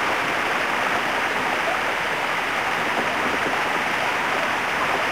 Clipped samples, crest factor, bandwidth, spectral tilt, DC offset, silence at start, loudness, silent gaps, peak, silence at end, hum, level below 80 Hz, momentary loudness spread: under 0.1%; 14 dB; 16 kHz; -2.5 dB/octave; 0.3%; 0 s; -22 LUFS; none; -8 dBFS; 0 s; none; -56 dBFS; 1 LU